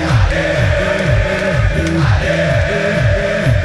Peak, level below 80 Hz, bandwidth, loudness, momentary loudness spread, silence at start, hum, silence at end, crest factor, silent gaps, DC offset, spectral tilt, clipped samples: 0 dBFS; -22 dBFS; 12 kHz; -14 LUFS; 1 LU; 0 s; none; 0 s; 12 dB; none; under 0.1%; -6.5 dB/octave; under 0.1%